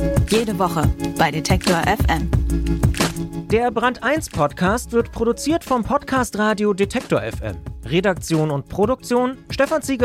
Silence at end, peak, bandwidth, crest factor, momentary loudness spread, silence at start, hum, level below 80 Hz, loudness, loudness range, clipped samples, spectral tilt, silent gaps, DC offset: 0 s; -4 dBFS; 16.5 kHz; 16 dB; 4 LU; 0 s; none; -30 dBFS; -20 LUFS; 2 LU; under 0.1%; -5.5 dB/octave; none; under 0.1%